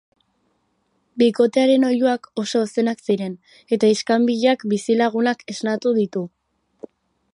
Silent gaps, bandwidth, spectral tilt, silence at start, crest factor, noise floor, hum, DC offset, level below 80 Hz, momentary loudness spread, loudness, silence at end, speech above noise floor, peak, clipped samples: none; 11 kHz; -5 dB/octave; 1.15 s; 16 dB; -68 dBFS; none; under 0.1%; -72 dBFS; 9 LU; -19 LUFS; 1.05 s; 49 dB; -4 dBFS; under 0.1%